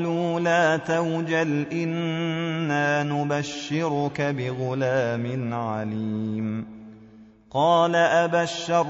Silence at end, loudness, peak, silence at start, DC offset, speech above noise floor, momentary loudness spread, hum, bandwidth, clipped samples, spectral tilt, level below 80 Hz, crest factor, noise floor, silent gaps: 0 s; -24 LUFS; -8 dBFS; 0 s; under 0.1%; 26 dB; 9 LU; none; 7.4 kHz; under 0.1%; -4.5 dB/octave; -64 dBFS; 16 dB; -49 dBFS; none